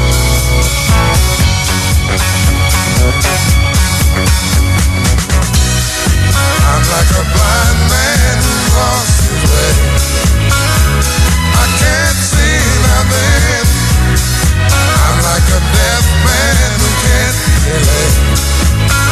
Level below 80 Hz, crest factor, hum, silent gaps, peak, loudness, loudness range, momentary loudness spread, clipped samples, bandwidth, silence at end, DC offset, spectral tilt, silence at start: -14 dBFS; 10 dB; none; none; 0 dBFS; -10 LUFS; 1 LU; 2 LU; under 0.1%; 14 kHz; 0 s; under 0.1%; -4 dB/octave; 0 s